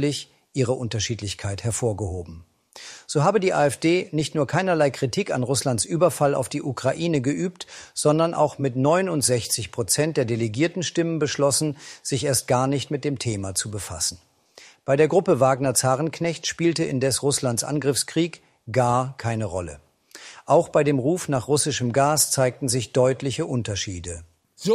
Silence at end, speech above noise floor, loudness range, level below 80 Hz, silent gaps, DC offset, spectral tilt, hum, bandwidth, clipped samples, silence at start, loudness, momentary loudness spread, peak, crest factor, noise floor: 0 s; 28 dB; 3 LU; -58 dBFS; none; under 0.1%; -4.5 dB/octave; none; 15.5 kHz; under 0.1%; 0 s; -23 LUFS; 10 LU; -6 dBFS; 18 dB; -51 dBFS